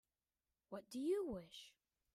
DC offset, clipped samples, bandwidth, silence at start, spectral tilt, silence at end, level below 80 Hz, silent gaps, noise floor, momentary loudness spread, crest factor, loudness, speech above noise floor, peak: under 0.1%; under 0.1%; 15 kHz; 0.7 s; -5.5 dB/octave; 0.45 s; -76 dBFS; none; under -90 dBFS; 17 LU; 16 dB; -46 LUFS; over 45 dB; -32 dBFS